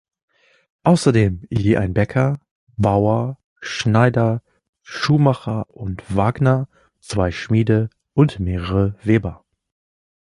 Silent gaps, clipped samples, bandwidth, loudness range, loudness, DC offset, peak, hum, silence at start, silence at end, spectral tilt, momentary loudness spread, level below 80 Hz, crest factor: 2.51-2.67 s, 3.44-3.56 s, 4.69-4.73 s; under 0.1%; 11.5 kHz; 2 LU; -19 LUFS; under 0.1%; -2 dBFS; none; 0.85 s; 0.95 s; -7 dB/octave; 12 LU; -38 dBFS; 18 dB